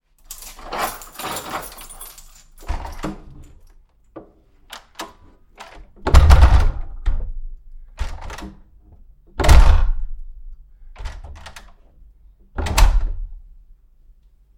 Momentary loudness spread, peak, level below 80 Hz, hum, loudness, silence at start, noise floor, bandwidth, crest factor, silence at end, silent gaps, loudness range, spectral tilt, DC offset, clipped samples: 27 LU; 0 dBFS; -20 dBFS; none; -20 LUFS; 0.3 s; -50 dBFS; 17 kHz; 20 dB; 1.2 s; none; 16 LU; -5 dB/octave; under 0.1%; under 0.1%